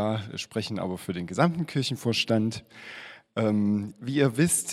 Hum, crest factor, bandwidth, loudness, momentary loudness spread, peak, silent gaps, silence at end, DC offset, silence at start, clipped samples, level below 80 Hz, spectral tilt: none; 22 dB; 16 kHz; -27 LUFS; 15 LU; -6 dBFS; none; 0 s; under 0.1%; 0 s; under 0.1%; -64 dBFS; -4.5 dB/octave